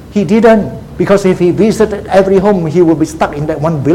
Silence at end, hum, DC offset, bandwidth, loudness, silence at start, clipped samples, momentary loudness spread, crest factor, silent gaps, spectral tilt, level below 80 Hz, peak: 0 s; none; under 0.1%; 15.5 kHz; -10 LUFS; 0 s; 0.2%; 7 LU; 10 dB; none; -7 dB/octave; -34 dBFS; 0 dBFS